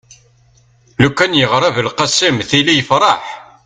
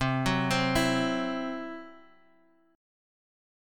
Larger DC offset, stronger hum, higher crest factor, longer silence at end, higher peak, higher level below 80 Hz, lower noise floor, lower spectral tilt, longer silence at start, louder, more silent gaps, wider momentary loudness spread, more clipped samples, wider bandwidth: neither; neither; about the same, 14 dB vs 18 dB; second, 0.25 s vs 1.8 s; first, 0 dBFS vs -14 dBFS; about the same, -46 dBFS vs -50 dBFS; second, -51 dBFS vs -65 dBFS; second, -3.5 dB/octave vs -5 dB/octave; first, 1 s vs 0 s; first, -12 LUFS vs -28 LUFS; neither; second, 6 LU vs 13 LU; neither; second, 9.6 kHz vs 17 kHz